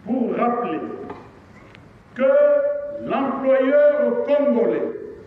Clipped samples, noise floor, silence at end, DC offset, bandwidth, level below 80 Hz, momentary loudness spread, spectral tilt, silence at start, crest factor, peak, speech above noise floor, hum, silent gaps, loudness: under 0.1%; -46 dBFS; 0 s; under 0.1%; 4.1 kHz; -60 dBFS; 16 LU; -8.5 dB/octave; 0.05 s; 12 dB; -8 dBFS; 28 dB; none; none; -19 LUFS